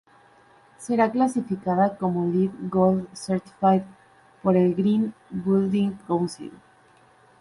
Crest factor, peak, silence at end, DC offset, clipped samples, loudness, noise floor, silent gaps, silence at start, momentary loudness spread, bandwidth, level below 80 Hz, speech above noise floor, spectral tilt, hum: 16 dB; -8 dBFS; 0.85 s; under 0.1%; under 0.1%; -24 LUFS; -56 dBFS; none; 0.8 s; 9 LU; 11.5 kHz; -62 dBFS; 33 dB; -7.5 dB/octave; none